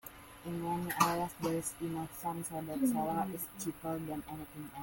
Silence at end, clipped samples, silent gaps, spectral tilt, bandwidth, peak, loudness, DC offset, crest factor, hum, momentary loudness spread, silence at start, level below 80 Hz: 0 s; under 0.1%; none; -5 dB/octave; 17 kHz; -12 dBFS; -37 LUFS; under 0.1%; 26 dB; none; 13 LU; 0.05 s; -64 dBFS